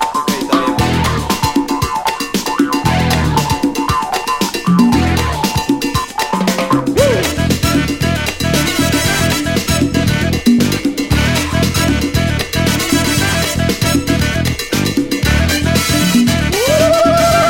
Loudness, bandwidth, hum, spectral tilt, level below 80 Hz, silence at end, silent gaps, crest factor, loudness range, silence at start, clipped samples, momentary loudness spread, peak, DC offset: -14 LUFS; 17 kHz; none; -4.5 dB/octave; -26 dBFS; 0 s; none; 14 dB; 1 LU; 0 s; under 0.1%; 5 LU; 0 dBFS; under 0.1%